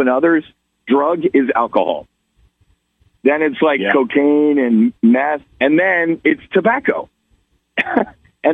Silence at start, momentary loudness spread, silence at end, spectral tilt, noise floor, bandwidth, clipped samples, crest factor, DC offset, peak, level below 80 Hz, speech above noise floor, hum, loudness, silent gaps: 0 s; 7 LU; 0 s; -8 dB/octave; -60 dBFS; 3.9 kHz; under 0.1%; 14 dB; under 0.1%; -2 dBFS; -58 dBFS; 45 dB; none; -15 LUFS; none